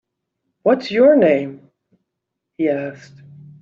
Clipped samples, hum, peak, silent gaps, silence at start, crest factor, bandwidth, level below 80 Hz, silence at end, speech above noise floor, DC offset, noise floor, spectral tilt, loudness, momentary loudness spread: under 0.1%; none; -2 dBFS; none; 0.65 s; 16 dB; 7.2 kHz; -64 dBFS; 0.65 s; 64 dB; under 0.1%; -79 dBFS; -5 dB/octave; -16 LUFS; 15 LU